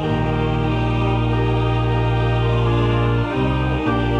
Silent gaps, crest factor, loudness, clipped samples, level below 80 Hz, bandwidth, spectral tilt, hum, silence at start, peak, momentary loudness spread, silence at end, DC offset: none; 10 dB; -19 LUFS; under 0.1%; -28 dBFS; 6.6 kHz; -8.5 dB/octave; none; 0 s; -8 dBFS; 2 LU; 0 s; under 0.1%